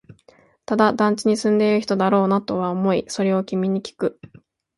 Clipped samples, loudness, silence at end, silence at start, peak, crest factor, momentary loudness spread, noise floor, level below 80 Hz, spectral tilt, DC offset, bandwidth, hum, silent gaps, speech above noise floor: under 0.1%; -20 LUFS; 0.65 s; 0.7 s; -2 dBFS; 18 dB; 7 LU; -55 dBFS; -62 dBFS; -6 dB/octave; under 0.1%; 11.5 kHz; none; none; 35 dB